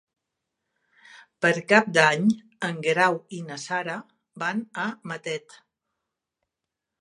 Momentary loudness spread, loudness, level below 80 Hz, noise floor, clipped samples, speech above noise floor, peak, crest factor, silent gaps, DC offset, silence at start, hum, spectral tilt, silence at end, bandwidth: 15 LU; -24 LUFS; -76 dBFS; -86 dBFS; under 0.1%; 61 dB; -2 dBFS; 26 dB; none; under 0.1%; 1.4 s; none; -4.5 dB/octave; 1.6 s; 11.5 kHz